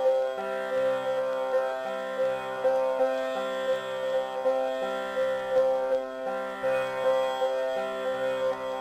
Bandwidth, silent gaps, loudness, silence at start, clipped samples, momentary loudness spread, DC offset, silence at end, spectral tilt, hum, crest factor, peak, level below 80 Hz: 15 kHz; none; -28 LUFS; 0 s; under 0.1%; 5 LU; under 0.1%; 0 s; -4 dB/octave; none; 14 dB; -14 dBFS; -68 dBFS